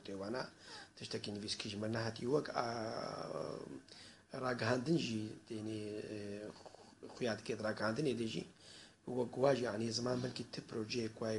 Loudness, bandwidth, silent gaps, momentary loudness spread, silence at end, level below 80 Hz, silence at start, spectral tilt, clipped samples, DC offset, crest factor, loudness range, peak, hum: -40 LUFS; 11.5 kHz; none; 17 LU; 0 s; -74 dBFS; 0 s; -5 dB/octave; under 0.1%; under 0.1%; 22 dB; 3 LU; -18 dBFS; none